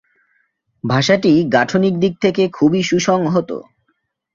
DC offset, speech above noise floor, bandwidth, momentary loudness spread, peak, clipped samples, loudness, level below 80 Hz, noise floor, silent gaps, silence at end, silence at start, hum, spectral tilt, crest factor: under 0.1%; 53 dB; 7.6 kHz; 7 LU; -2 dBFS; under 0.1%; -15 LUFS; -54 dBFS; -68 dBFS; none; 0.7 s; 0.85 s; none; -5.5 dB/octave; 16 dB